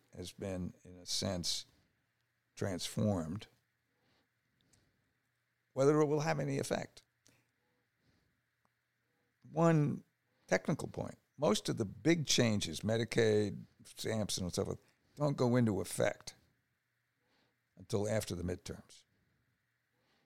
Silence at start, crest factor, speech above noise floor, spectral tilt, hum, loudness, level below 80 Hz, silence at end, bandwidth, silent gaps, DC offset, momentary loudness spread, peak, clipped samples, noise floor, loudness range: 0.15 s; 22 dB; 48 dB; -5 dB/octave; none; -35 LUFS; -66 dBFS; 1.45 s; 16.5 kHz; none; under 0.1%; 16 LU; -16 dBFS; under 0.1%; -82 dBFS; 9 LU